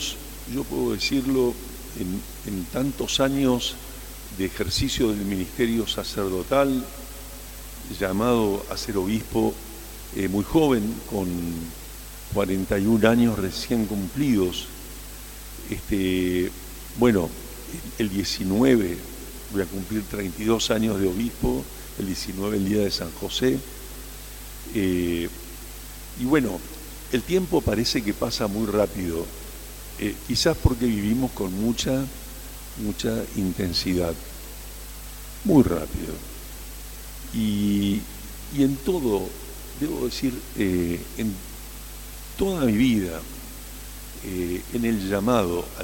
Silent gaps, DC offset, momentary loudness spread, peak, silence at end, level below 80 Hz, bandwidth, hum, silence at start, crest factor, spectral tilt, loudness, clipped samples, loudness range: none; under 0.1%; 17 LU; -4 dBFS; 0 s; -40 dBFS; 17 kHz; 50 Hz at -40 dBFS; 0 s; 22 dB; -5 dB/octave; -25 LUFS; under 0.1%; 3 LU